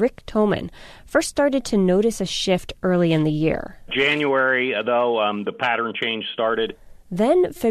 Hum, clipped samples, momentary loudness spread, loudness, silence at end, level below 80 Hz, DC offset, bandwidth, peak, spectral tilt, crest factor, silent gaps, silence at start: none; under 0.1%; 6 LU; -21 LUFS; 0 s; -46 dBFS; under 0.1%; 13.5 kHz; -6 dBFS; -5 dB/octave; 16 dB; none; 0 s